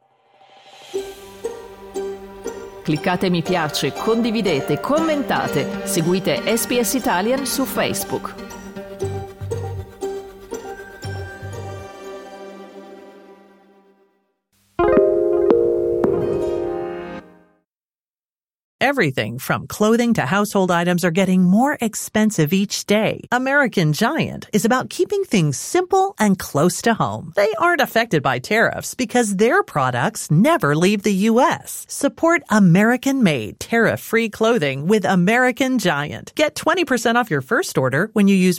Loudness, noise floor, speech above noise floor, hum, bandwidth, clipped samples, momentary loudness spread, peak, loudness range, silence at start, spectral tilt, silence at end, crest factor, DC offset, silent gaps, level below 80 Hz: -18 LUFS; under -90 dBFS; over 72 dB; none; 17.5 kHz; under 0.1%; 16 LU; -2 dBFS; 13 LU; 0.8 s; -5 dB/octave; 0 s; 18 dB; under 0.1%; 18.10-18.14 s, 18.64-18.79 s; -52 dBFS